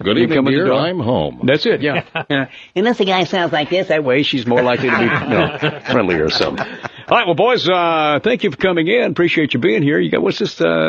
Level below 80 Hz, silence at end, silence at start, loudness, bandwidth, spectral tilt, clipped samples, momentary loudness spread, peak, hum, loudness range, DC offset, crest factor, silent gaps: -48 dBFS; 0 s; 0 s; -15 LUFS; 7.6 kHz; -6 dB/octave; under 0.1%; 5 LU; 0 dBFS; none; 2 LU; under 0.1%; 16 dB; none